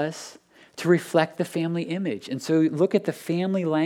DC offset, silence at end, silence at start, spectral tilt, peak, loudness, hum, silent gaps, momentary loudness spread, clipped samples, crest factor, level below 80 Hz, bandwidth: under 0.1%; 0 s; 0 s; -6.5 dB/octave; -6 dBFS; -25 LUFS; none; none; 10 LU; under 0.1%; 18 dB; -80 dBFS; 15.5 kHz